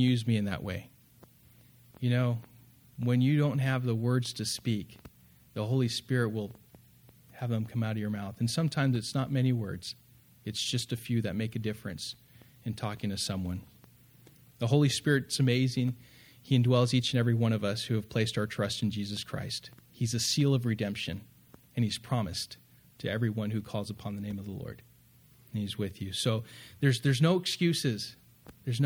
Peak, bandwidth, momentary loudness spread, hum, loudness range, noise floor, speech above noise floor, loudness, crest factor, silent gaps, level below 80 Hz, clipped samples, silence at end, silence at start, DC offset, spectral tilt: -12 dBFS; 17.5 kHz; 14 LU; none; 7 LU; -60 dBFS; 30 dB; -31 LUFS; 20 dB; none; -62 dBFS; under 0.1%; 0 s; 0 s; under 0.1%; -5.5 dB/octave